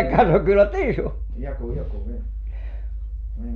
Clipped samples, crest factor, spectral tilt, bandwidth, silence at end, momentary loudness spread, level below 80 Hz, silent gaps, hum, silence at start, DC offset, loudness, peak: under 0.1%; 16 dB; -9 dB/octave; 4.6 kHz; 0 s; 17 LU; -28 dBFS; none; none; 0 s; under 0.1%; -22 LUFS; -6 dBFS